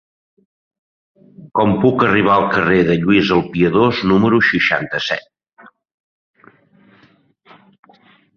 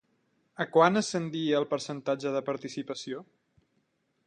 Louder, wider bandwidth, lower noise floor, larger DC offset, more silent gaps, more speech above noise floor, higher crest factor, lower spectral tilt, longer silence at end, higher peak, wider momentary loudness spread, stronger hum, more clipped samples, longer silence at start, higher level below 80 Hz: first, -15 LUFS vs -29 LUFS; second, 6.8 kHz vs 10.5 kHz; second, -53 dBFS vs -75 dBFS; neither; neither; second, 39 dB vs 46 dB; second, 16 dB vs 22 dB; first, -7 dB/octave vs -5 dB/octave; first, 3.15 s vs 1.05 s; first, -2 dBFS vs -8 dBFS; second, 7 LU vs 14 LU; neither; neither; first, 1.4 s vs 0.6 s; first, -48 dBFS vs -76 dBFS